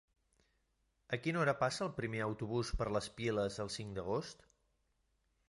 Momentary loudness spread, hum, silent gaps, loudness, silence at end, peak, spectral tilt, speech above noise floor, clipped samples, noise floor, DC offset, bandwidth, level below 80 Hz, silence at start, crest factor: 8 LU; none; none; -38 LUFS; 1.15 s; -20 dBFS; -5.5 dB/octave; 42 dB; under 0.1%; -80 dBFS; under 0.1%; 11.5 kHz; -54 dBFS; 1.1 s; 20 dB